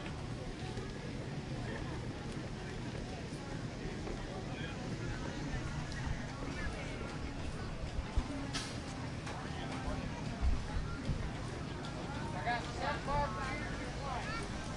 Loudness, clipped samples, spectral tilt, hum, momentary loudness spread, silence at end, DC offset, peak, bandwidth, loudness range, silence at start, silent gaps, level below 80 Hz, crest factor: -41 LUFS; under 0.1%; -5.5 dB/octave; none; 6 LU; 0 s; under 0.1%; -20 dBFS; 11.5 kHz; 4 LU; 0 s; none; -46 dBFS; 18 dB